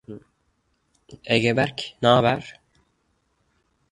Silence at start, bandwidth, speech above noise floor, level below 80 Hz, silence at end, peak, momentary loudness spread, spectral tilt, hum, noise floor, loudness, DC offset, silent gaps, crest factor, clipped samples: 0.1 s; 11.5 kHz; 48 dB; -58 dBFS; 1.4 s; -2 dBFS; 25 LU; -5.5 dB/octave; none; -70 dBFS; -21 LUFS; under 0.1%; none; 22 dB; under 0.1%